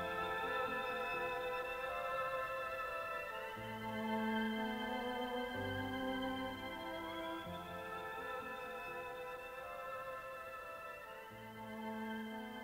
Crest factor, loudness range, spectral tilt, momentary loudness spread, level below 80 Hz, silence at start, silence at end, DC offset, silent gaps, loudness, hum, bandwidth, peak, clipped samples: 16 dB; 6 LU; -5 dB/octave; 9 LU; -66 dBFS; 0 s; 0 s; under 0.1%; none; -43 LUFS; none; 16 kHz; -26 dBFS; under 0.1%